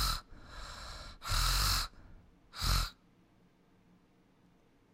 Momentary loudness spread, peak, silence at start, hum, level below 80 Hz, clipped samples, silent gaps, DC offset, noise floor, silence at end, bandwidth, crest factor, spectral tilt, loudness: 19 LU; -18 dBFS; 0 s; none; -42 dBFS; under 0.1%; none; under 0.1%; -67 dBFS; 2 s; 16 kHz; 20 dB; -2 dB/octave; -35 LUFS